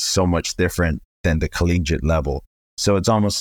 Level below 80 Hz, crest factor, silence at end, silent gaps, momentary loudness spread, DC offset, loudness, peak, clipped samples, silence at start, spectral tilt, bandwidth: -30 dBFS; 14 dB; 0 s; 1.05-1.24 s, 2.47-2.77 s; 6 LU; under 0.1%; -20 LUFS; -6 dBFS; under 0.1%; 0 s; -5 dB/octave; 19 kHz